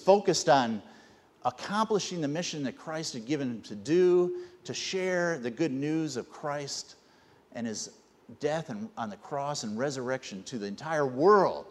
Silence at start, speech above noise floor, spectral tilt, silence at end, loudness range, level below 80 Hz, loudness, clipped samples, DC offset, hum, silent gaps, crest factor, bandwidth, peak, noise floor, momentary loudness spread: 0 s; 31 dB; -4.5 dB/octave; 0 s; 7 LU; -74 dBFS; -30 LUFS; under 0.1%; under 0.1%; none; none; 22 dB; 12 kHz; -8 dBFS; -61 dBFS; 15 LU